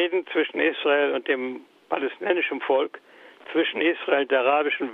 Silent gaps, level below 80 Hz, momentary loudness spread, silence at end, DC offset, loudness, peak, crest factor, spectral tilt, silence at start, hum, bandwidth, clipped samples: none; -78 dBFS; 8 LU; 0 s; under 0.1%; -24 LUFS; -6 dBFS; 18 dB; -5.5 dB/octave; 0 s; none; 4.5 kHz; under 0.1%